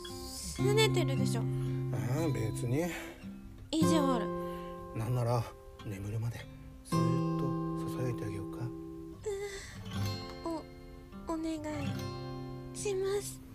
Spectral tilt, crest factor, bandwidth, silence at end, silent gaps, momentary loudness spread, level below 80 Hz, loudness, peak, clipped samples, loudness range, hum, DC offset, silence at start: -6 dB/octave; 20 dB; 15.5 kHz; 0 s; none; 15 LU; -54 dBFS; -35 LUFS; -14 dBFS; under 0.1%; 7 LU; none; under 0.1%; 0 s